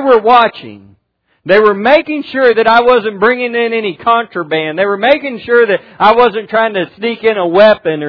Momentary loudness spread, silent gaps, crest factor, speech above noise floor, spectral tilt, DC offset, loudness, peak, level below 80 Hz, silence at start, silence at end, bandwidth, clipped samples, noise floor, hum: 8 LU; none; 10 dB; 50 dB; -7 dB/octave; under 0.1%; -11 LUFS; 0 dBFS; -50 dBFS; 0 s; 0 s; 5.4 kHz; 0.7%; -60 dBFS; none